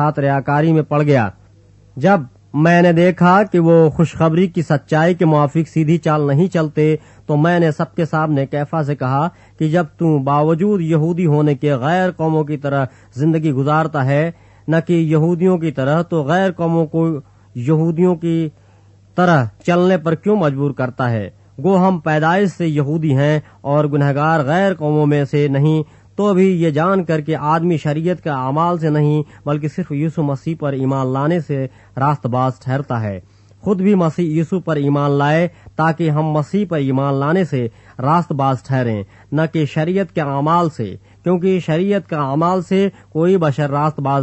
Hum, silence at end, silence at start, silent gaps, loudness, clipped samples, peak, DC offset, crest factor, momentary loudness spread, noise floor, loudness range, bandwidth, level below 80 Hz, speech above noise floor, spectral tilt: none; 0 s; 0 s; none; -16 LUFS; under 0.1%; 0 dBFS; under 0.1%; 16 dB; 7 LU; -47 dBFS; 4 LU; 8.4 kHz; -54 dBFS; 32 dB; -8.5 dB/octave